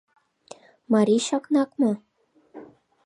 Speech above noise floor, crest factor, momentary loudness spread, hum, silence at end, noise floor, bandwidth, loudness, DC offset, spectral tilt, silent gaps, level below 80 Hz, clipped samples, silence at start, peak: 29 dB; 18 dB; 5 LU; none; 0.4 s; -51 dBFS; 11.5 kHz; -23 LUFS; under 0.1%; -5.5 dB/octave; none; -76 dBFS; under 0.1%; 0.9 s; -8 dBFS